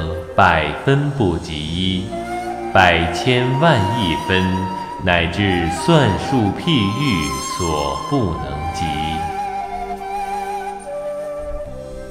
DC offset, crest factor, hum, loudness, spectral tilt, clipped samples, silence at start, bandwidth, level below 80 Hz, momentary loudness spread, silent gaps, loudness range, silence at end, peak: under 0.1%; 18 dB; none; -18 LUFS; -5.5 dB/octave; under 0.1%; 0 s; 15.5 kHz; -36 dBFS; 12 LU; none; 7 LU; 0 s; 0 dBFS